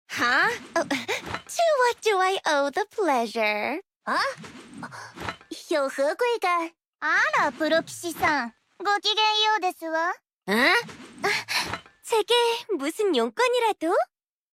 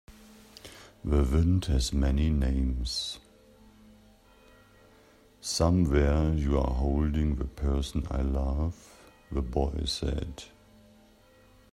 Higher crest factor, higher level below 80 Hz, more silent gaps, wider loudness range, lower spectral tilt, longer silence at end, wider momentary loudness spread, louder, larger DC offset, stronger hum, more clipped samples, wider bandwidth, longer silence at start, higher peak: about the same, 18 dB vs 18 dB; second, -64 dBFS vs -34 dBFS; first, 3.96-4.00 s, 6.87-6.93 s, 10.34-10.41 s vs none; about the same, 4 LU vs 6 LU; second, -2.5 dB/octave vs -6 dB/octave; second, 0.5 s vs 1.3 s; about the same, 15 LU vs 16 LU; first, -24 LUFS vs -29 LUFS; neither; neither; neither; first, 16.5 kHz vs 12.5 kHz; about the same, 0.1 s vs 0.1 s; about the same, -8 dBFS vs -10 dBFS